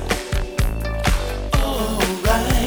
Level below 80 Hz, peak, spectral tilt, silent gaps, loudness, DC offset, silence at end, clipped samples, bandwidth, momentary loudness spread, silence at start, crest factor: -22 dBFS; -4 dBFS; -4.5 dB/octave; none; -21 LUFS; under 0.1%; 0 s; under 0.1%; over 20 kHz; 5 LU; 0 s; 16 dB